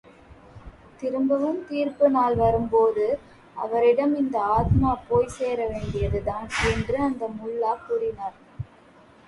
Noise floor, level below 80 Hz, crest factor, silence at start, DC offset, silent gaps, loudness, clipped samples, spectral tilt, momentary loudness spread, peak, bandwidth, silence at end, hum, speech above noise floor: -52 dBFS; -40 dBFS; 16 dB; 0.3 s; under 0.1%; none; -24 LUFS; under 0.1%; -7 dB/octave; 13 LU; -8 dBFS; 11.5 kHz; 0.6 s; none; 29 dB